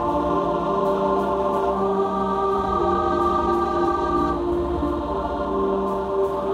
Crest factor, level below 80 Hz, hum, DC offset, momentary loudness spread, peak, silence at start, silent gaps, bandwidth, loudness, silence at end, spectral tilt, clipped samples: 12 dB; -38 dBFS; none; under 0.1%; 3 LU; -8 dBFS; 0 s; none; 12 kHz; -22 LUFS; 0 s; -7.5 dB/octave; under 0.1%